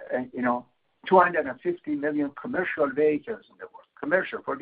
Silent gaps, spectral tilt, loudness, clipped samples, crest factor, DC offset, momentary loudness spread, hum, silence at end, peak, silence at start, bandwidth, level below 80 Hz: none; -10 dB/octave; -26 LUFS; under 0.1%; 22 dB; under 0.1%; 18 LU; none; 0 s; -6 dBFS; 0 s; 4.8 kHz; -66 dBFS